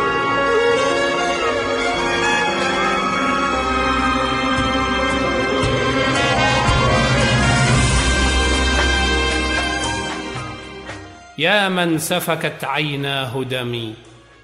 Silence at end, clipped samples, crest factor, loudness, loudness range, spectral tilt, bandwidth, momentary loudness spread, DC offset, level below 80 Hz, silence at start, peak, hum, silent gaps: 0.3 s; under 0.1%; 16 dB; -17 LUFS; 4 LU; -4 dB/octave; 16 kHz; 9 LU; under 0.1%; -28 dBFS; 0 s; -2 dBFS; none; none